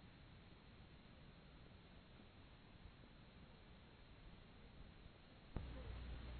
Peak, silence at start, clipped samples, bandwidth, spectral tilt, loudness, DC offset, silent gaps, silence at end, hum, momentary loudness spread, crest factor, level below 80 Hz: -32 dBFS; 0 s; under 0.1%; 4.5 kHz; -5 dB/octave; -61 LUFS; under 0.1%; none; 0 s; none; 10 LU; 26 dB; -60 dBFS